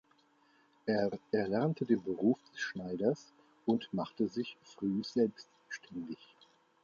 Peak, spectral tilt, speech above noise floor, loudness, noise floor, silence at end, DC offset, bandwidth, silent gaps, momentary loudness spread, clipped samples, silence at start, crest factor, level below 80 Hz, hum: -18 dBFS; -7 dB/octave; 35 dB; -35 LUFS; -69 dBFS; 0.7 s; under 0.1%; 7.2 kHz; none; 12 LU; under 0.1%; 0.85 s; 18 dB; -74 dBFS; none